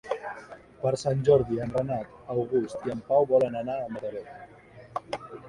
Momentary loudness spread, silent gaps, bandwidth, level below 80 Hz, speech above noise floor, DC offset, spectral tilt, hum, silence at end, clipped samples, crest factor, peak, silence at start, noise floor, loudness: 18 LU; none; 11 kHz; -58 dBFS; 20 dB; under 0.1%; -7 dB/octave; none; 0 s; under 0.1%; 18 dB; -10 dBFS; 0.05 s; -47 dBFS; -28 LUFS